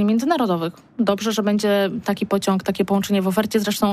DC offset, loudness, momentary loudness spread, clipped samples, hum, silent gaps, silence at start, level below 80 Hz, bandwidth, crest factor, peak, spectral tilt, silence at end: under 0.1%; -21 LUFS; 4 LU; under 0.1%; none; none; 0 s; -56 dBFS; 15.5 kHz; 14 dB; -6 dBFS; -5.5 dB/octave; 0 s